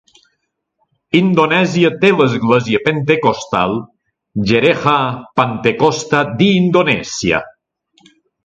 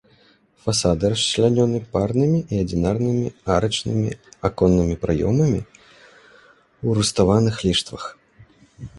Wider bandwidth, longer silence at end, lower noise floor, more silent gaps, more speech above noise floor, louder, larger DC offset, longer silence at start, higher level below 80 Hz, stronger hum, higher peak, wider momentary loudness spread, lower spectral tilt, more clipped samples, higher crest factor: second, 8.2 kHz vs 11.5 kHz; first, 0.95 s vs 0 s; first, -70 dBFS vs -56 dBFS; neither; first, 56 dB vs 37 dB; first, -14 LUFS vs -20 LUFS; neither; first, 1.15 s vs 0.65 s; second, -48 dBFS vs -40 dBFS; neither; about the same, 0 dBFS vs -2 dBFS; second, 5 LU vs 10 LU; about the same, -5.5 dB/octave vs -5.5 dB/octave; neither; about the same, 16 dB vs 18 dB